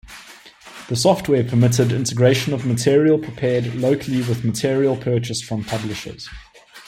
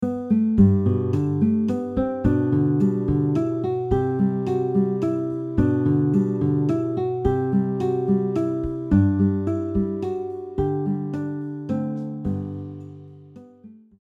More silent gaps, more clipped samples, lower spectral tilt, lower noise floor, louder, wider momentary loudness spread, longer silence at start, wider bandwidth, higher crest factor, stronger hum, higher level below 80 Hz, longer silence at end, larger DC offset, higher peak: neither; neither; second, -5.5 dB/octave vs -10.5 dB/octave; second, -43 dBFS vs -47 dBFS; first, -19 LUFS vs -22 LUFS; first, 17 LU vs 8 LU; about the same, 0.05 s vs 0 s; first, 15.5 kHz vs 7.4 kHz; about the same, 16 dB vs 16 dB; neither; second, -50 dBFS vs -40 dBFS; second, 0.05 s vs 0.3 s; neither; first, -2 dBFS vs -6 dBFS